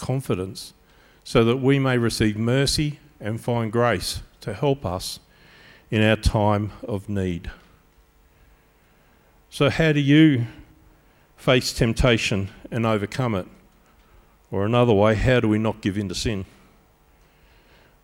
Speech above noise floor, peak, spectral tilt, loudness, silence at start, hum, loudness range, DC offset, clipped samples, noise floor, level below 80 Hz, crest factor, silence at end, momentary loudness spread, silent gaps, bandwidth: 36 dB; -4 dBFS; -6 dB/octave; -22 LUFS; 0 s; none; 5 LU; under 0.1%; under 0.1%; -58 dBFS; -38 dBFS; 18 dB; 1.6 s; 14 LU; none; 16.5 kHz